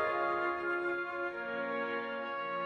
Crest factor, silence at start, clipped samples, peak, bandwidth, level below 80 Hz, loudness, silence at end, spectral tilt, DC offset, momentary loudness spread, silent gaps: 14 dB; 0 s; under 0.1%; -22 dBFS; 8.8 kHz; -72 dBFS; -35 LUFS; 0 s; -6 dB/octave; under 0.1%; 5 LU; none